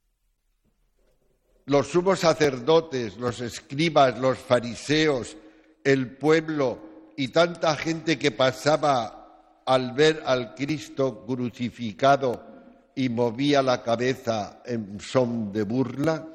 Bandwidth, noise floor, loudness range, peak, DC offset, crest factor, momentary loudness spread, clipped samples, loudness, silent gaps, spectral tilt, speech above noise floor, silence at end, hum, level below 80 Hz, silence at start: 14 kHz; -71 dBFS; 2 LU; -6 dBFS; under 0.1%; 18 dB; 11 LU; under 0.1%; -24 LUFS; none; -5.5 dB/octave; 47 dB; 0 s; none; -58 dBFS; 1.65 s